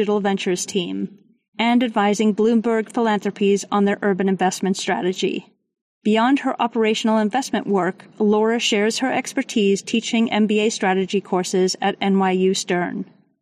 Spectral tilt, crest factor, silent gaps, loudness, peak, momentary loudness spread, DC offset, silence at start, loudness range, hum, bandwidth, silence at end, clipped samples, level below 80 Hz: -4.5 dB/octave; 12 dB; 1.48-1.53 s, 5.81-6.01 s; -20 LUFS; -8 dBFS; 6 LU; under 0.1%; 0 s; 2 LU; none; 14 kHz; 0.35 s; under 0.1%; -68 dBFS